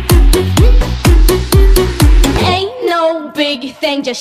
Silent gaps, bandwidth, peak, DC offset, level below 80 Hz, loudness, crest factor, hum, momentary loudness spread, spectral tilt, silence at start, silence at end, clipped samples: none; 15 kHz; 0 dBFS; under 0.1%; -12 dBFS; -12 LUFS; 10 dB; none; 6 LU; -5 dB/octave; 0 s; 0 s; under 0.1%